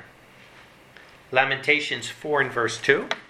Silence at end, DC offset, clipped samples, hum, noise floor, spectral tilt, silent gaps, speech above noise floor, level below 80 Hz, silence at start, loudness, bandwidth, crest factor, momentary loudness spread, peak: 0.05 s; under 0.1%; under 0.1%; none; -50 dBFS; -3.5 dB/octave; none; 26 dB; -66 dBFS; 0 s; -23 LUFS; 14 kHz; 24 dB; 6 LU; -2 dBFS